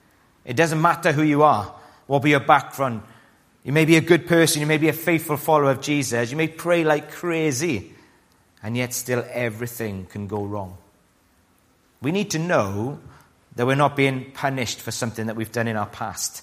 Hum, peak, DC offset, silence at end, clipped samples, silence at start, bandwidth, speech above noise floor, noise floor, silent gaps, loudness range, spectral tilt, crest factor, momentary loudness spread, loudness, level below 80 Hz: none; 0 dBFS; under 0.1%; 0 s; under 0.1%; 0.45 s; 15.5 kHz; 39 dB; -60 dBFS; none; 9 LU; -5 dB/octave; 22 dB; 13 LU; -21 LUFS; -60 dBFS